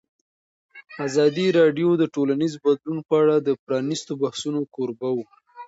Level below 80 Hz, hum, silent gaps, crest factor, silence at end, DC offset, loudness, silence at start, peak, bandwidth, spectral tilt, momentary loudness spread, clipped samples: -70 dBFS; none; 3.59-3.67 s; 16 dB; 0 s; under 0.1%; -22 LUFS; 0.75 s; -6 dBFS; 8 kHz; -6 dB/octave; 9 LU; under 0.1%